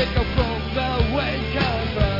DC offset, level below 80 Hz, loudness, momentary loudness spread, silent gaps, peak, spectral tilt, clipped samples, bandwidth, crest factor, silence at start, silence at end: 0.4%; -28 dBFS; -23 LUFS; 2 LU; none; -6 dBFS; -7.5 dB/octave; under 0.1%; 5.8 kHz; 16 dB; 0 s; 0 s